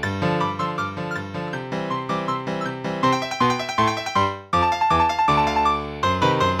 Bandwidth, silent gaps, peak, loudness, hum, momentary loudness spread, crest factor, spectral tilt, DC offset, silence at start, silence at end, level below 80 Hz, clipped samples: 15.5 kHz; none; -6 dBFS; -22 LUFS; none; 9 LU; 16 dB; -5 dB/octave; under 0.1%; 0 s; 0 s; -44 dBFS; under 0.1%